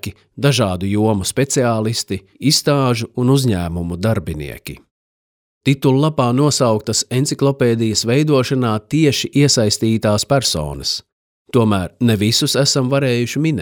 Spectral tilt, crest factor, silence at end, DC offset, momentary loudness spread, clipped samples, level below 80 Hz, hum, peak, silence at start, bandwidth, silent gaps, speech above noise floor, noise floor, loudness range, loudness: -5 dB/octave; 14 dB; 0 s; under 0.1%; 7 LU; under 0.1%; -44 dBFS; none; -2 dBFS; 0.05 s; 19 kHz; 4.91-5.61 s, 11.12-11.45 s; over 74 dB; under -90 dBFS; 3 LU; -16 LUFS